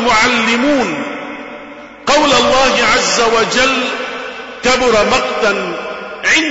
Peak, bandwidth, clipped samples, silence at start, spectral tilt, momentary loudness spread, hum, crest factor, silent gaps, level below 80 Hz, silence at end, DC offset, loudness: -2 dBFS; 8 kHz; under 0.1%; 0 s; -2 dB/octave; 15 LU; none; 12 dB; none; -40 dBFS; 0 s; under 0.1%; -12 LUFS